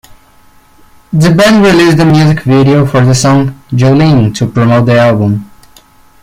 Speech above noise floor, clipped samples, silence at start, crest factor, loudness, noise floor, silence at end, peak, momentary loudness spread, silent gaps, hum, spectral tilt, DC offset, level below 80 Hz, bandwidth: 35 dB; under 0.1%; 0.1 s; 8 dB; -7 LUFS; -42 dBFS; 0.75 s; 0 dBFS; 6 LU; none; none; -6.5 dB/octave; under 0.1%; -36 dBFS; 15.5 kHz